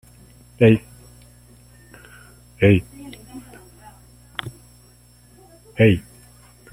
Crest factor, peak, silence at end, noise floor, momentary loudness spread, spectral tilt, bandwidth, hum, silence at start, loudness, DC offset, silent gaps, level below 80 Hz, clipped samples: 22 dB; -2 dBFS; 0.7 s; -51 dBFS; 24 LU; -7.5 dB/octave; 14.5 kHz; 60 Hz at -45 dBFS; 0.6 s; -19 LUFS; under 0.1%; none; -48 dBFS; under 0.1%